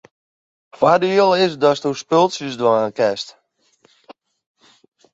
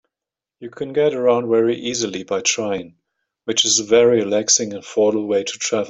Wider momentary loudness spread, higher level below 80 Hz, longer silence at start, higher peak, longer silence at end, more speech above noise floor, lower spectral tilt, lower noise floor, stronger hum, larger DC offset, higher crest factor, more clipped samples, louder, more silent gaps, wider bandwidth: second, 7 LU vs 12 LU; about the same, -64 dBFS vs -62 dBFS; first, 0.8 s vs 0.6 s; about the same, -2 dBFS vs -2 dBFS; first, 1 s vs 0 s; second, 43 dB vs 69 dB; first, -5 dB/octave vs -2.5 dB/octave; second, -59 dBFS vs -88 dBFS; neither; neither; about the same, 18 dB vs 18 dB; neither; about the same, -17 LUFS vs -18 LUFS; neither; about the same, 8 kHz vs 8.4 kHz